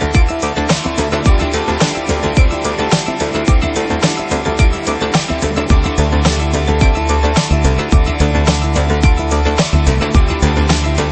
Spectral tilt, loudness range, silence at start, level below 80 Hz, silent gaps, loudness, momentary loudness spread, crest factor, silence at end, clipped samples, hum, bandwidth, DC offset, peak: -5 dB/octave; 2 LU; 0 s; -16 dBFS; none; -14 LUFS; 3 LU; 12 dB; 0 s; under 0.1%; none; 8.8 kHz; under 0.1%; 0 dBFS